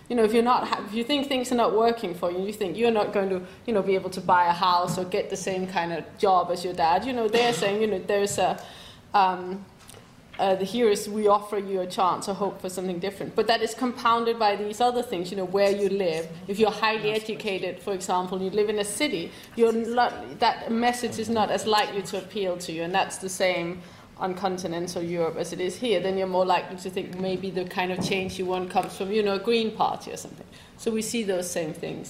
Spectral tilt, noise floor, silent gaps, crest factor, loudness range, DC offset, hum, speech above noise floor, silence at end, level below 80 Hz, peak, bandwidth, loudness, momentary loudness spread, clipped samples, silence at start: -4 dB/octave; -48 dBFS; none; 18 dB; 3 LU; under 0.1%; none; 23 dB; 0 s; -60 dBFS; -8 dBFS; 16 kHz; -26 LUFS; 9 LU; under 0.1%; 0.1 s